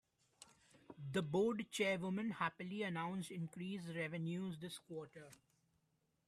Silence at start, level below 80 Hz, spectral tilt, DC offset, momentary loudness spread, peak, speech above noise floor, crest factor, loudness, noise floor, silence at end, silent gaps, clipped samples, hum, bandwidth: 0.4 s; -82 dBFS; -5.5 dB/octave; under 0.1%; 21 LU; -26 dBFS; 40 dB; 18 dB; -43 LUFS; -82 dBFS; 0.95 s; none; under 0.1%; none; 14 kHz